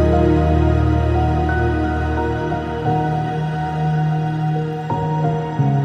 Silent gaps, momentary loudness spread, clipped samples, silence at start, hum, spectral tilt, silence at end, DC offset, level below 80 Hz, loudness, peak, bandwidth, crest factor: none; 6 LU; under 0.1%; 0 s; none; -9 dB/octave; 0 s; under 0.1%; -26 dBFS; -19 LUFS; -4 dBFS; 7.2 kHz; 14 dB